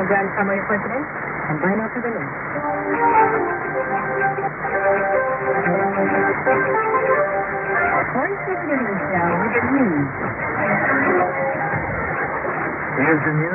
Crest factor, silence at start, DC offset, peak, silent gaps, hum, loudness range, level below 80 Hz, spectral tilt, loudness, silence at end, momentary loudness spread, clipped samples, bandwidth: 16 dB; 0 s; under 0.1%; -4 dBFS; none; none; 2 LU; -48 dBFS; -13.5 dB/octave; -20 LUFS; 0 s; 7 LU; under 0.1%; 3 kHz